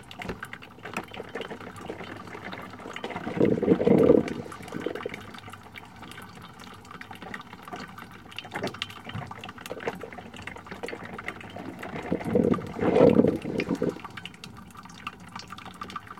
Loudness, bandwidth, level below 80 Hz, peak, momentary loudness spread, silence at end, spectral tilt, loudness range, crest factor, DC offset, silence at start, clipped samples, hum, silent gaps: -28 LUFS; 16 kHz; -58 dBFS; -6 dBFS; 22 LU; 0.05 s; -7 dB/octave; 14 LU; 24 dB; 0.1%; 0 s; under 0.1%; none; none